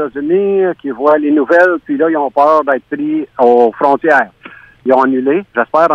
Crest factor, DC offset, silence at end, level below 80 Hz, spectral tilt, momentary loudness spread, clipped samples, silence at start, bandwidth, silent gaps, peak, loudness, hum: 12 dB; under 0.1%; 0 s; -58 dBFS; -7.5 dB/octave; 7 LU; 0.2%; 0 s; 7.4 kHz; none; 0 dBFS; -12 LUFS; none